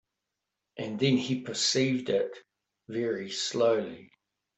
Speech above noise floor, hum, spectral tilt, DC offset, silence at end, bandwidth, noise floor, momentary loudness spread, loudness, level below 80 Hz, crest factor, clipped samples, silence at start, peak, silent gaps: 57 dB; none; -4 dB/octave; under 0.1%; 0.5 s; 8.4 kHz; -86 dBFS; 14 LU; -29 LUFS; -72 dBFS; 18 dB; under 0.1%; 0.75 s; -12 dBFS; none